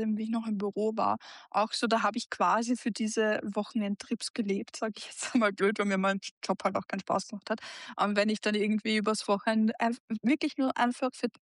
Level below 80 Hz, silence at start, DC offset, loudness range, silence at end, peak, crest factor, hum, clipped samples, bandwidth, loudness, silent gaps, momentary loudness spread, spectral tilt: -78 dBFS; 0 s; under 0.1%; 2 LU; 0.15 s; -14 dBFS; 16 dB; none; under 0.1%; 11.5 kHz; -30 LUFS; 4.30-4.34 s, 6.31-6.41 s, 10.00-10.08 s; 7 LU; -4.5 dB/octave